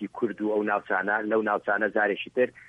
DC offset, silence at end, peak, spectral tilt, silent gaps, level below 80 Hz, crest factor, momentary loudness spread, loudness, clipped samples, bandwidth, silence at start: under 0.1%; 0.2 s; -10 dBFS; -7 dB/octave; none; -70 dBFS; 16 dB; 3 LU; -26 LUFS; under 0.1%; 6 kHz; 0 s